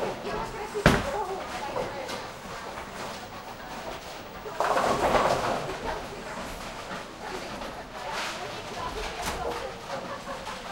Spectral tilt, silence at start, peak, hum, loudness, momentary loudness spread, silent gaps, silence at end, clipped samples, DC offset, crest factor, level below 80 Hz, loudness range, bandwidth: -4.5 dB/octave; 0 s; -2 dBFS; none; -31 LUFS; 14 LU; none; 0 s; under 0.1%; under 0.1%; 28 dB; -46 dBFS; 6 LU; 16 kHz